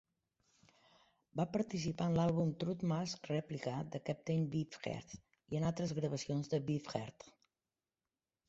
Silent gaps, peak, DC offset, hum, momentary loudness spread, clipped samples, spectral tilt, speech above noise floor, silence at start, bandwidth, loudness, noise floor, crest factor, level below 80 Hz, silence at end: none; -22 dBFS; under 0.1%; none; 10 LU; under 0.1%; -7 dB/octave; over 52 dB; 1.35 s; 8 kHz; -39 LUFS; under -90 dBFS; 18 dB; -68 dBFS; 1.2 s